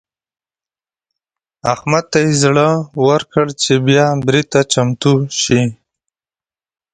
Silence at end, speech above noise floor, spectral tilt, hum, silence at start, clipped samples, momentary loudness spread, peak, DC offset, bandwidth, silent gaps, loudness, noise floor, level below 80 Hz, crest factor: 1.2 s; over 77 dB; -5 dB/octave; none; 1.65 s; under 0.1%; 5 LU; 0 dBFS; under 0.1%; 9.4 kHz; none; -14 LUFS; under -90 dBFS; -50 dBFS; 16 dB